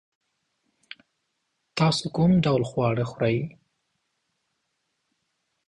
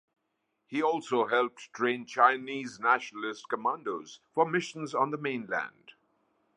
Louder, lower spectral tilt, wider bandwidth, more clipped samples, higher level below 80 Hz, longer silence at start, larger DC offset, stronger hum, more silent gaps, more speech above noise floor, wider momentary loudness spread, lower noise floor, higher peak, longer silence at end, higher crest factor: first, -24 LUFS vs -30 LUFS; first, -6.5 dB/octave vs -4.5 dB/octave; about the same, 11 kHz vs 10.5 kHz; neither; first, -56 dBFS vs -84 dBFS; first, 1.75 s vs 0.7 s; neither; neither; neither; first, 54 dB vs 50 dB; second, 9 LU vs 12 LU; about the same, -77 dBFS vs -80 dBFS; about the same, -10 dBFS vs -8 dBFS; first, 2.2 s vs 0.85 s; second, 18 dB vs 24 dB